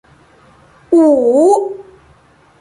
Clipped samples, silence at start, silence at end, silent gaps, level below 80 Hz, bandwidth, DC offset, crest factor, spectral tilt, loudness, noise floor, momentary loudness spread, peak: under 0.1%; 0.9 s; 0.8 s; none; -56 dBFS; 11.5 kHz; under 0.1%; 12 dB; -6 dB/octave; -11 LUFS; -48 dBFS; 14 LU; -2 dBFS